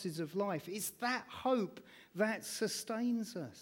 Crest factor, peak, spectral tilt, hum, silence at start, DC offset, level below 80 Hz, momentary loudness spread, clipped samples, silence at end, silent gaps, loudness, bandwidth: 16 dB; -22 dBFS; -4 dB/octave; none; 0 s; under 0.1%; -78 dBFS; 8 LU; under 0.1%; 0 s; none; -38 LUFS; 18 kHz